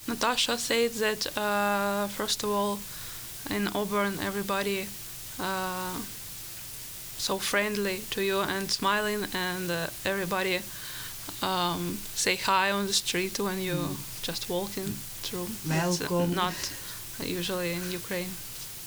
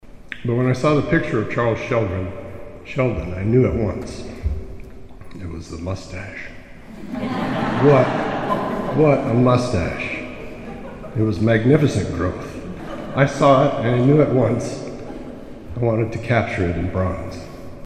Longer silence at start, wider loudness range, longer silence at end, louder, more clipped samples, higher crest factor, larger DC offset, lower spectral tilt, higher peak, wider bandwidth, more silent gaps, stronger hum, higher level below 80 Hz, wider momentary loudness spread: about the same, 0 s vs 0.05 s; second, 3 LU vs 6 LU; about the same, 0 s vs 0 s; second, -29 LUFS vs -20 LUFS; neither; about the same, 20 dB vs 20 dB; neither; second, -3 dB/octave vs -7.5 dB/octave; second, -10 dBFS vs 0 dBFS; first, over 20 kHz vs 10 kHz; neither; neither; second, -54 dBFS vs -38 dBFS; second, 11 LU vs 19 LU